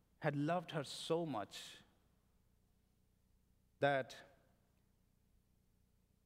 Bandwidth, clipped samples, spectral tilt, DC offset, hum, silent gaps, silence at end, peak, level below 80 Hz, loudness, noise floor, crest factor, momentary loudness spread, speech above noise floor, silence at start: 16 kHz; under 0.1%; -5.5 dB/octave; under 0.1%; 60 Hz at -80 dBFS; none; 2 s; -20 dBFS; -78 dBFS; -41 LUFS; -76 dBFS; 24 dB; 16 LU; 36 dB; 0.2 s